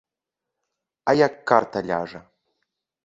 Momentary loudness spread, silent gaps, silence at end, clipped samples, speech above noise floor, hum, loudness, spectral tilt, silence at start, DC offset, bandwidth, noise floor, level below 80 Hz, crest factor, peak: 10 LU; none; 0.85 s; under 0.1%; 65 dB; none; -22 LUFS; -6 dB/octave; 1.05 s; under 0.1%; 7.8 kHz; -86 dBFS; -62 dBFS; 24 dB; -2 dBFS